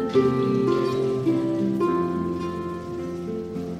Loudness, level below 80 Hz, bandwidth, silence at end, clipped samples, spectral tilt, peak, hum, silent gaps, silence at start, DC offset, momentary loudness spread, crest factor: -25 LUFS; -54 dBFS; 12.5 kHz; 0 s; under 0.1%; -8 dB/octave; -8 dBFS; none; none; 0 s; under 0.1%; 9 LU; 16 dB